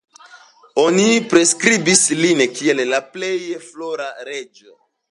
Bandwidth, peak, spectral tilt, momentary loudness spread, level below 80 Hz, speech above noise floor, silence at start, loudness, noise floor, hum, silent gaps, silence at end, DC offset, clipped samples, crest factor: 11.5 kHz; 0 dBFS; -3 dB/octave; 16 LU; -68 dBFS; 29 dB; 0.35 s; -16 LUFS; -46 dBFS; none; none; 0.65 s; under 0.1%; under 0.1%; 18 dB